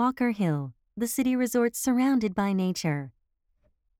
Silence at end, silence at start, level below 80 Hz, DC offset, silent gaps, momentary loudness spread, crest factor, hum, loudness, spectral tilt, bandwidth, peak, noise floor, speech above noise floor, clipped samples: 0.9 s; 0 s; -62 dBFS; under 0.1%; none; 9 LU; 14 dB; none; -27 LUFS; -5.5 dB/octave; 18 kHz; -14 dBFS; -70 dBFS; 45 dB; under 0.1%